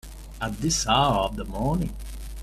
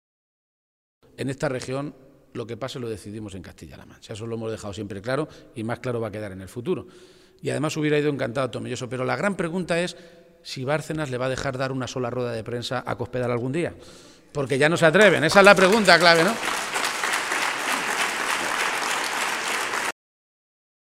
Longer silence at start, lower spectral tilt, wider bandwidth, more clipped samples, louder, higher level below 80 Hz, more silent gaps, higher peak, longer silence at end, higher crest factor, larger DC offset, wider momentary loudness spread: second, 0.05 s vs 1.2 s; about the same, -4 dB/octave vs -4 dB/octave; about the same, 15 kHz vs 16 kHz; neither; about the same, -25 LUFS vs -23 LUFS; first, -36 dBFS vs -56 dBFS; neither; second, -8 dBFS vs 0 dBFS; second, 0 s vs 1 s; second, 18 dB vs 24 dB; neither; about the same, 18 LU vs 19 LU